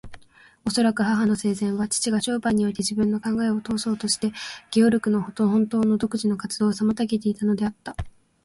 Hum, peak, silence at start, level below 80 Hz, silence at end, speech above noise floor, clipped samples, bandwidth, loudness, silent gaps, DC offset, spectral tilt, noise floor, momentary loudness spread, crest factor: none; -8 dBFS; 0.05 s; -50 dBFS; 0.35 s; 25 dB; under 0.1%; 11.5 kHz; -23 LUFS; none; under 0.1%; -5 dB/octave; -48 dBFS; 6 LU; 16 dB